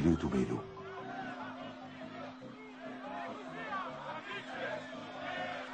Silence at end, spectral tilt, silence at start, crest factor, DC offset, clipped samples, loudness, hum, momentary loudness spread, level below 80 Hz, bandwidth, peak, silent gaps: 0 s; -6.5 dB/octave; 0 s; 22 dB; under 0.1%; under 0.1%; -41 LUFS; none; 12 LU; -58 dBFS; 9 kHz; -18 dBFS; none